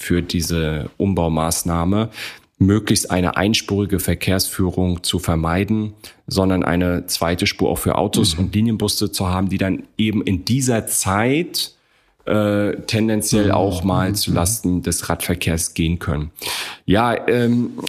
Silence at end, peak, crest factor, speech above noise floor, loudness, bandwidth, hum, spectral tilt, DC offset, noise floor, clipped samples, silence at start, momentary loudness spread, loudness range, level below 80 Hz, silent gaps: 0 s; -2 dBFS; 16 dB; 40 dB; -19 LUFS; 15.5 kHz; none; -4.5 dB/octave; under 0.1%; -58 dBFS; under 0.1%; 0 s; 6 LU; 1 LU; -38 dBFS; none